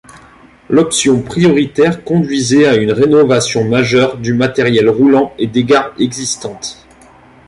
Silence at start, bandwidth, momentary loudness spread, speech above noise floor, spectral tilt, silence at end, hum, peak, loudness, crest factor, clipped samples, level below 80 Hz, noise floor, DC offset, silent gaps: 0.15 s; 11.5 kHz; 8 LU; 30 dB; -5 dB/octave; 0.75 s; none; 0 dBFS; -12 LUFS; 12 dB; under 0.1%; -46 dBFS; -42 dBFS; under 0.1%; none